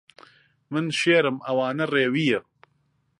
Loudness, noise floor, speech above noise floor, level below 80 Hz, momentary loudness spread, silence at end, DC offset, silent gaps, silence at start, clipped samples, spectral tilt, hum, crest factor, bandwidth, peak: -23 LUFS; -69 dBFS; 46 dB; -72 dBFS; 9 LU; 0.8 s; under 0.1%; none; 0.7 s; under 0.1%; -5 dB/octave; none; 20 dB; 11.5 kHz; -6 dBFS